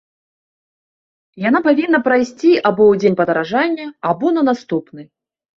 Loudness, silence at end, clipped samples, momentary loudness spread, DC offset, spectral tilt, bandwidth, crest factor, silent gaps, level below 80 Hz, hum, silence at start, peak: -15 LUFS; 0.55 s; under 0.1%; 9 LU; under 0.1%; -6.5 dB/octave; 7.4 kHz; 16 dB; none; -60 dBFS; none; 1.35 s; -2 dBFS